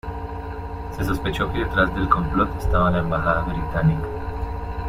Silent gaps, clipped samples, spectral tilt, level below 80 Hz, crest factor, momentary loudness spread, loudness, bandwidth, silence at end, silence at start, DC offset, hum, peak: none; under 0.1%; -7.5 dB/octave; -30 dBFS; 20 dB; 12 LU; -23 LUFS; 16 kHz; 0 s; 0.05 s; under 0.1%; none; -2 dBFS